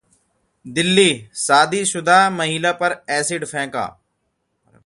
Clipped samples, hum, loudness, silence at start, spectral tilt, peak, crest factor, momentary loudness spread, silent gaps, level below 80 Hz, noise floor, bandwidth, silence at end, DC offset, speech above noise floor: under 0.1%; none; -17 LUFS; 0.65 s; -3 dB/octave; 0 dBFS; 20 dB; 11 LU; none; -60 dBFS; -71 dBFS; 11.5 kHz; 0.95 s; under 0.1%; 53 dB